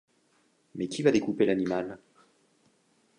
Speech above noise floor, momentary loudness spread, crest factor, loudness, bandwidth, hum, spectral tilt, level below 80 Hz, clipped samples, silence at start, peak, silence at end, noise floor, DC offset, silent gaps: 41 dB; 18 LU; 22 dB; -28 LUFS; 11 kHz; none; -6 dB/octave; -68 dBFS; under 0.1%; 0.75 s; -8 dBFS; 1.25 s; -68 dBFS; under 0.1%; none